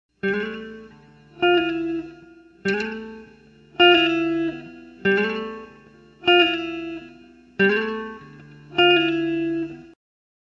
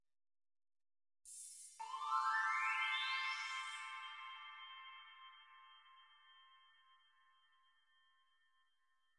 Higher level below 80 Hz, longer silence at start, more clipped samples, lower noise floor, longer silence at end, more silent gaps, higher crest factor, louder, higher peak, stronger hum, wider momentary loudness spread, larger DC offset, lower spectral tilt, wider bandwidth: first, -58 dBFS vs under -90 dBFS; second, 0.25 s vs 1.25 s; neither; second, -50 dBFS vs -84 dBFS; second, 0.65 s vs 2.65 s; neither; about the same, 20 dB vs 20 dB; first, -21 LUFS vs -42 LUFS; first, -2 dBFS vs -28 dBFS; neither; about the same, 22 LU vs 24 LU; neither; first, -5.5 dB/octave vs 6 dB/octave; second, 7.2 kHz vs 11.5 kHz